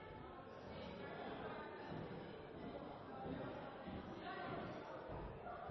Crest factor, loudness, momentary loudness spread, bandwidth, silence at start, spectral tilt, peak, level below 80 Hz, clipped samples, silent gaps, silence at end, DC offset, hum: 14 dB; -51 LUFS; 5 LU; 6 kHz; 0 s; -5 dB/octave; -36 dBFS; -66 dBFS; under 0.1%; none; 0 s; under 0.1%; none